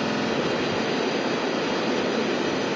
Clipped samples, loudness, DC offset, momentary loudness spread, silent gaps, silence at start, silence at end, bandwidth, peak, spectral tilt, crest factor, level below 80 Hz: under 0.1%; -25 LUFS; under 0.1%; 1 LU; none; 0 s; 0 s; 7.8 kHz; -12 dBFS; -4.5 dB/octave; 14 dB; -58 dBFS